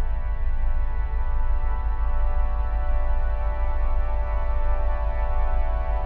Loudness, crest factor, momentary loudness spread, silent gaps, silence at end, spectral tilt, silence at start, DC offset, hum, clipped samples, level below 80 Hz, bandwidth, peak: -28 LUFS; 10 dB; 2 LU; none; 0 s; -9.5 dB/octave; 0 s; under 0.1%; none; under 0.1%; -22 dBFS; 3.1 kHz; -12 dBFS